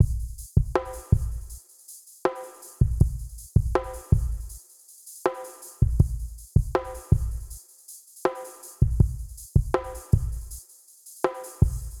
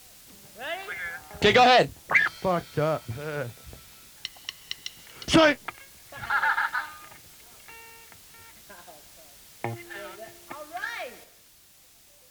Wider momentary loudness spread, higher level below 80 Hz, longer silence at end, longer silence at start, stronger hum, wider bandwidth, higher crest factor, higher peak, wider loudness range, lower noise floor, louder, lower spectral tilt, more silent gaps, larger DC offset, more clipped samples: second, 19 LU vs 27 LU; first, -30 dBFS vs -56 dBFS; second, 0 s vs 1.1 s; second, 0 s vs 0.55 s; neither; second, 17.5 kHz vs over 20 kHz; about the same, 20 dB vs 22 dB; about the same, -6 dBFS vs -8 dBFS; second, 0 LU vs 18 LU; second, -51 dBFS vs -56 dBFS; about the same, -27 LUFS vs -25 LUFS; first, -7.5 dB/octave vs -4 dB/octave; neither; neither; neither